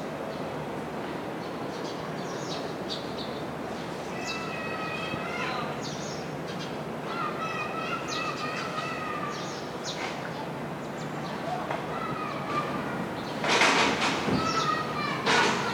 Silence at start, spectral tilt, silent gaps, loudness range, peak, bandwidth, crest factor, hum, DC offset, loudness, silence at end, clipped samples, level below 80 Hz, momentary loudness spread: 0 s; -4 dB/octave; none; 8 LU; -10 dBFS; 19 kHz; 22 dB; none; under 0.1%; -30 LUFS; 0 s; under 0.1%; -60 dBFS; 11 LU